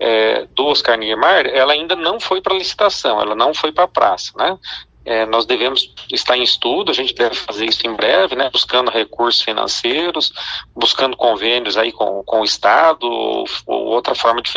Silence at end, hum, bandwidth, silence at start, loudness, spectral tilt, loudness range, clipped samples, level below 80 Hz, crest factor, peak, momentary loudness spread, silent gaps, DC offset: 0 s; none; 9.6 kHz; 0 s; -15 LUFS; -2 dB/octave; 2 LU; under 0.1%; -52 dBFS; 16 dB; 0 dBFS; 6 LU; none; under 0.1%